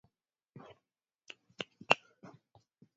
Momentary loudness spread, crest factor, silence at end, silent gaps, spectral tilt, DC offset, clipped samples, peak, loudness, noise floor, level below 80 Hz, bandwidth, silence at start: 26 LU; 38 dB; 1 s; none; -0.5 dB/octave; under 0.1%; under 0.1%; -4 dBFS; -34 LUFS; -87 dBFS; -86 dBFS; 7.4 kHz; 1.9 s